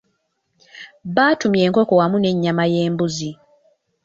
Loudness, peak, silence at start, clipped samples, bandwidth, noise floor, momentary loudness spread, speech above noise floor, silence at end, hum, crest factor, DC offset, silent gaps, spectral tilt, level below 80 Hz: -18 LUFS; -2 dBFS; 0.75 s; under 0.1%; 7.8 kHz; -69 dBFS; 17 LU; 52 dB; 0.7 s; none; 16 dB; under 0.1%; none; -6 dB/octave; -58 dBFS